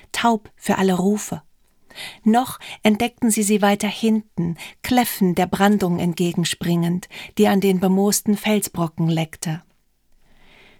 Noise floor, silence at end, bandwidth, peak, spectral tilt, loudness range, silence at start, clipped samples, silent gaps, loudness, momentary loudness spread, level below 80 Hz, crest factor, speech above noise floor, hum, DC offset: -58 dBFS; 1.2 s; 19 kHz; -2 dBFS; -5 dB/octave; 2 LU; 0.15 s; under 0.1%; none; -20 LUFS; 11 LU; -54 dBFS; 18 dB; 38 dB; none; under 0.1%